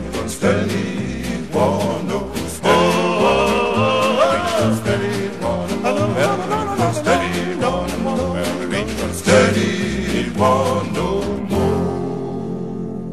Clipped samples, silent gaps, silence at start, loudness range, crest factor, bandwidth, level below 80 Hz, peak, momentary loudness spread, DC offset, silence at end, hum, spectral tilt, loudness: under 0.1%; none; 0 s; 3 LU; 18 dB; 14.5 kHz; -38 dBFS; 0 dBFS; 9 LU; 1%; 0 s; none; -5.5 dB/octave; -18 LUFS